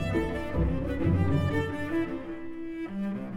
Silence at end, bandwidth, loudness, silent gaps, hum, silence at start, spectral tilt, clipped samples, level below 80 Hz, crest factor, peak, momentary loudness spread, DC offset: 0 s; 12 kHz; -30 LUFS; none; none; 0 s; -8.5 dB/octave; under 0.1%; -40 dBFS; 14 dB; -14 dBFS; 11 LU; under 0.1%